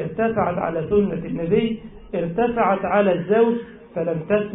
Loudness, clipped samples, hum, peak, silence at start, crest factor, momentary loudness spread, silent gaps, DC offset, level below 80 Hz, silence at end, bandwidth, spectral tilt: -21 LUFS; under 0.1%; none; -6 dBFS; 0 s; 16 dB; 9 LU; none; under 0.1%; -48 dBFS; 0 s; 4 kHz; -12 dB/octave